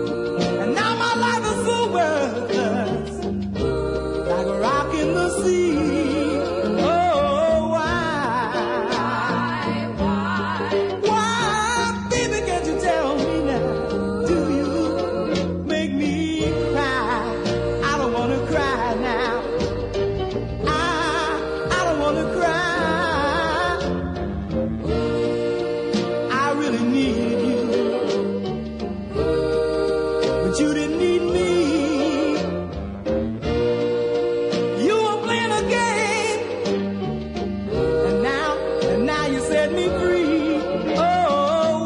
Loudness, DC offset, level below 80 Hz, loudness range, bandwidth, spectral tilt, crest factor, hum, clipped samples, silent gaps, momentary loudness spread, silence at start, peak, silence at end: -21 LUFS; under 0.1%; -40 dBFS; 2 LU; 11 kHz; -5 dB/octave; 14 dB; none; under 0.1%; none; 5 LU; 0 s; -8 dBFS; 0 s